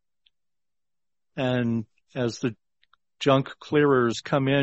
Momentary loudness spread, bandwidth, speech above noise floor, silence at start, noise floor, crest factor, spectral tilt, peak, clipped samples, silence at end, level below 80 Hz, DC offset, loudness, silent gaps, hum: 11 LU; 8.2 kHz; over 67 dB; 1.35 s; under -90 dBFS; 20 dB; -6.5 dB/octave; -6 dBFS; under 0.1%; 0 s; -62 dBFS; under 0.1%; -25 LUFS; none; none